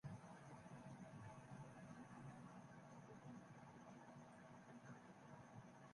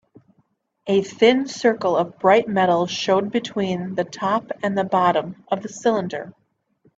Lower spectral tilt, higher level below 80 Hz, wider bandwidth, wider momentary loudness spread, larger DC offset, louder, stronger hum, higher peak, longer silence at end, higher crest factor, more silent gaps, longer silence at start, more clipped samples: first, -6.5 dB/octave vs -5 dB/octave; second, -82 dBFS vs -64 dBFS; first, 11 kHz vs 8 kHz; second, 3 LU vs 10 LU; neither; second, -61 LUFS vs -21 LUFS; neither; second, -44 dBFS vs -2 dBFS; second, 0 s vs 0.65 s; about the same, 16 dB vs 18 dB; neither; second, 0.05 s vs 0.85 s; neither